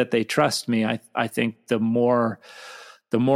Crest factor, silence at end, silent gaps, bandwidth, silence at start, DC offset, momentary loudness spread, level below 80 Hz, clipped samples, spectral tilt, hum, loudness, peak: 18 dB; 0 s; none; 15.5 kHz; 0 s; under 0.1%; 20 LU; -68 dBFS; under 0.1%; -5.5 dB/octave; none; -23 LUFS; -6 dBFS